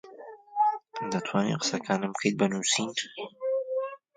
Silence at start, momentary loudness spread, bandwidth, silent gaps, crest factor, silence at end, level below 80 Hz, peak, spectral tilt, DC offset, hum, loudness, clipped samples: 0.05 s; 10 LU; 9.6 kHz; none; 20 dB; 0.2 s; -72 dBFS; -10 dBFS; -3.5 dB/octave; under 0.1%; none; -29 LUFS; under 0.1%